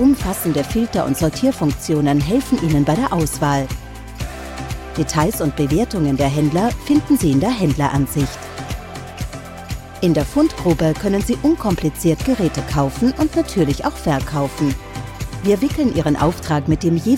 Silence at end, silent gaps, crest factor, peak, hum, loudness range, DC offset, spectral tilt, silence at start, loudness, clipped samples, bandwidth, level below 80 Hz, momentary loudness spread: 0 s; none; 14 dB; -4 dBFS; none; 3 LU; under 0.1%; -6 dB/octave; 0 s; -18 LUFS; under 0.1%; 16.5 kHz; -32 dBFS; 13 LU